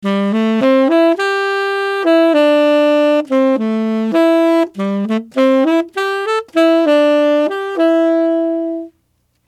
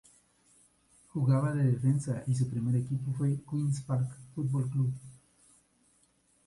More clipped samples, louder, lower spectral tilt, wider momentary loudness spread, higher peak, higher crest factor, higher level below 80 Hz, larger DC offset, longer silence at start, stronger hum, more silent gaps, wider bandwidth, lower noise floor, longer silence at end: neither; first, -14 LUFS vs -31 LUFS; second, -6 dB/octave vs -8.5 dB/octave; about the same, 7 LU vs 7 LU; first, 0 dBFS vs -16 dBFS; about the same, 14 dB vs 16 dB; about the same, -68 dBFS vs -64 dBFS; neither; second, 0 s vs 1.15 s; about the same, 60 Hz at -65 dBFS vs 60 Hz at -55 dBFS; neither; first, 13 kHz vs 11.5 kHz; second, -62 dBFS vs -69 dBFS; second, 0.65 s vs 1.3 s